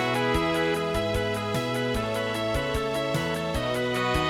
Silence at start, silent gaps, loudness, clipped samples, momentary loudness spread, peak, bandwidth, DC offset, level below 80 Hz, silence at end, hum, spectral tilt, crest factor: 0 s; none; -27 LUFS; under 0.1%; 3 LU; -12 dBFS; 18 kHz; under 0.1%; -40 dBFS; 0 s; none; -5 dB/octave; 14 dB